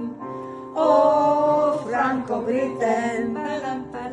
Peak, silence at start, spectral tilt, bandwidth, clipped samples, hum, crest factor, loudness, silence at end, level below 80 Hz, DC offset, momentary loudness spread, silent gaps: -4 dBFS; 0 s; -6 dB/octave; 10.5 kHz; under 0.1%; none; 18 dB; -22 LUFS; 0 s; -60 dBFS; under 0.1%; 14 LU; none